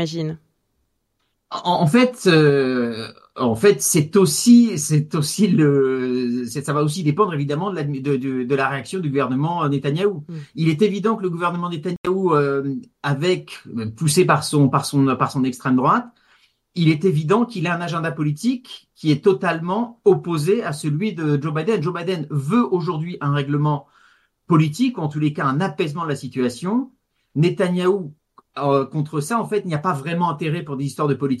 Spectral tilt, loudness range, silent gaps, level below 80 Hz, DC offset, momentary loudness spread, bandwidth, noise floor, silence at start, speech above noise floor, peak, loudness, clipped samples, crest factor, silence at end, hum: -6 dB/octave; 5 LU; 11.97-12.04 s; -62 dBFS; under 0.1%; 9 LU; 12.5 kHz; -71 dBFS; 0 s; 52 dB; -2 dBFS; -20 LUFS; under 0.1%; 18 dB; 0 s; none